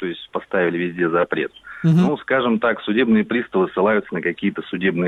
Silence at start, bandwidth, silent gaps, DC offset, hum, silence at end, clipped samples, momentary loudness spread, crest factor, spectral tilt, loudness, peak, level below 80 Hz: 0 s; 6.8 kHz; none; under 0.1%; none; 0 s; under 0.1%; 7 LU; 14 dB; -8.5 dB/octave; -20 LUFS; -6 dBFS; -58 dBFS